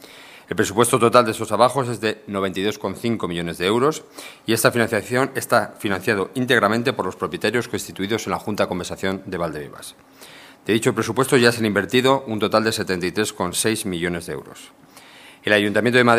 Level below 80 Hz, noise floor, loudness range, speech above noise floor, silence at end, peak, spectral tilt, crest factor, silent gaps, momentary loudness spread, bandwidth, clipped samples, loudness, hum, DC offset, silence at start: -58 dBFS; -45 dBFS; 5 LU; 24 dB; 0 s; 0 dBFS; -4.5 dB/octave; 20 dB; none; 12 LU; 15.5 kHz; under 0.1%; -20 LUFS; none; under 0.1%; 0 s